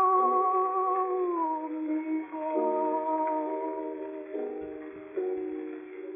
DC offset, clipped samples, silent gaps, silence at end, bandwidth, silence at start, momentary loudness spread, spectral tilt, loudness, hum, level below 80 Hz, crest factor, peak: under 0.1%; under 0.1%; none; 0 s; 3.6 kHz; 0 s; 13 LU; 1 dB/octave; -30 LUFS; none; -76 dBFS; 16 dB; -14 dBFS